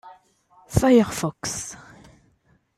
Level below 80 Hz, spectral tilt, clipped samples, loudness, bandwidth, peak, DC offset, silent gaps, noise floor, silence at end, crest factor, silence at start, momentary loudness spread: -44 dBFS; -5.5 dB/octave; under 0.1%; -22 LUFS; 15.5 kHz; -4 dBFS; under 0.1%; none; -63 dBFS; 1 s; 20 dB; 0.05 s; 17 LU